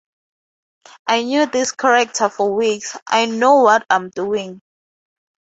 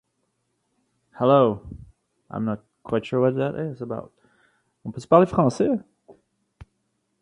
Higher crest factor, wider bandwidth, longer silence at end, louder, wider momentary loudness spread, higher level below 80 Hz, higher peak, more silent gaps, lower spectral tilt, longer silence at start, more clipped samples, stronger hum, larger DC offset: second, 16 dB vs 24 dB; second, 8.2 kHz vs 11 kHz; about the same, 1 s vs 1.1 s; first, -16 LUFS vs -22 LUFS; second, 11 LU vs 19 LU; second, -66 dBFS vs -54 dBFS; about the same, -2 dBFS vs -2 dBFS; first, 3.02-3.06 s vs none; second, -2.5 dB/octave vs -8 dB/octave; about the same, 1.05 s vs 1.15 s; neither; neither; neither